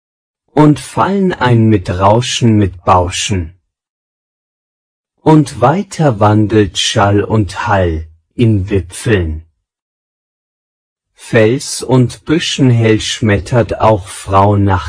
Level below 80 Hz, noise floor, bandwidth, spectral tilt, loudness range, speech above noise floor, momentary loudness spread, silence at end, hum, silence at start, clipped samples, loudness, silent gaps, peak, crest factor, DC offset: -34 dBFS; under -90 dBFS; 10.5 kHz; -6 dB/octave; 5 LU; over 79 dB; 7 LU; 0 s; none; 0.55 s; 0.6%; -12 LUFS; 3.89-5.04 s, 9.82-10.96 s; 0 dBFS; 12 dB; under 0.1%